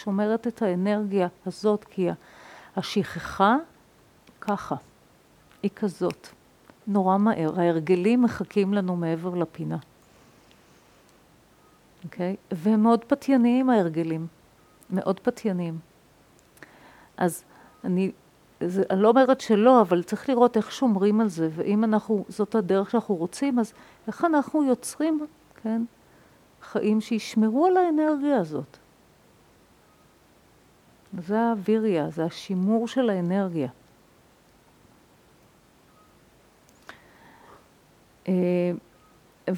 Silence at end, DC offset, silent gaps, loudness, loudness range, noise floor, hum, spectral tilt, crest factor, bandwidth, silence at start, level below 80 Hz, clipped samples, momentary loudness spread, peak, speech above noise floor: 0 s; under 0.1%; none; -25 LUFS; 10 LU; -58 dBFS; none; -7 dB/octave; 22 dB; 14.5 kHz; 0 s; -66 dBFS; under 0.1%; 13 LU; -4 dBFS; 34 dB